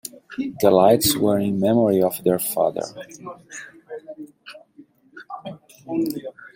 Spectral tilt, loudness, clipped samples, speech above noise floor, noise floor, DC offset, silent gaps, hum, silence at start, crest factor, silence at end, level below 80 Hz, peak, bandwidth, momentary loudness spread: -5 dB/octave; -20 LUFS; under 0.1%; 31 dB; -51 dBFS; under 0.1%; none; none; 0.3 s; 20 dB; 0.05 s; -58 dBFS; -2 dBFS; 16.5 kHz; 23 LU